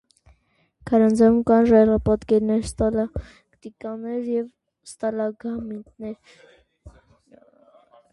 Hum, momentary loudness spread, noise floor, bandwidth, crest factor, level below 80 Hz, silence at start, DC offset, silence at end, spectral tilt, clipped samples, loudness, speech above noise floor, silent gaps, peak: none; 20 LU; -65 dBFS; 11.5 kHz; 18 dB; -44 dBFS; 0.85 s; under 0.1%; 1.25 s; -7.5 dB/octave; under 0.1%; -21 LUFS; 44 dB; none; -4 dBFS